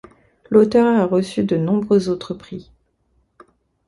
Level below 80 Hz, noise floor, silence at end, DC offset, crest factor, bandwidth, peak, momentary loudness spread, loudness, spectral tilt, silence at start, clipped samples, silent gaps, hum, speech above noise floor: -54 dBFS; -64 dBFS; 1.25 s; under 0.1%; 18 dB; 11.5 kHz; -2 dBFS; 17 LU; -17 LUFS; -7.5 dB/octave; 0.5 s; under 0.1%; none; none; 47 dB